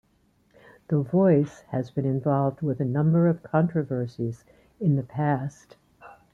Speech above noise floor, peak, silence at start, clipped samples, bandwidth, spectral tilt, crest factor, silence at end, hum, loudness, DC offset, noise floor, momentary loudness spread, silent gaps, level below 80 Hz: 41 dB; -8 dBFS; 0.9 s; under 0.1%; 7.2 kHz; -10 dB/octave; 18 dB; 0.25 s; none; -25 LUFS; under 0.1%; -65 dBFS; 10 LU; none; -62 dBFS